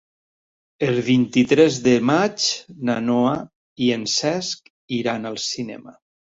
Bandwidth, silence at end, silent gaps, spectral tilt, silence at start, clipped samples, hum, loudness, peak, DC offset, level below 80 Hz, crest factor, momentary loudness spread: 7.8 kHz; 0.5 s; 3.56-3.76 s, 4.70-4.88 s; -4.5 dB/octave; 0.8 s; under 0.1%; none; -20 LUFS; -2 dBFS; under 0.1%; -60 dBFS; 18 dB; 13 LU